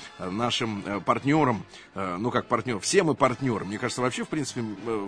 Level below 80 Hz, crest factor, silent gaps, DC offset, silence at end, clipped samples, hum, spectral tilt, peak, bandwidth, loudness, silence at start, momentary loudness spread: -58 dBFS; 20 dB; none; under 0.1%; 0 s; under 0.1%; none; -4.5 dB/octave; -6 dBFS; 10.5 kHz; -27 LUFS; 0 s; 10 LU